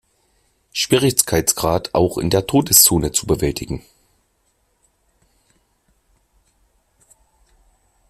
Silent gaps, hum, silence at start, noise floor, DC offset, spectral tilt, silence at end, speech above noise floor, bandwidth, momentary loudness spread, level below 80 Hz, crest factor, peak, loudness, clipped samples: none; none; 0.75 s; -65 dBFS; under 0.1%; -3.5 dB/octave; 4.3 s; 48 dB; 16 kHz; 16 LU; -42 dBFS; 22 dB; 0 dBFS; -16 LUFS; under 0.1%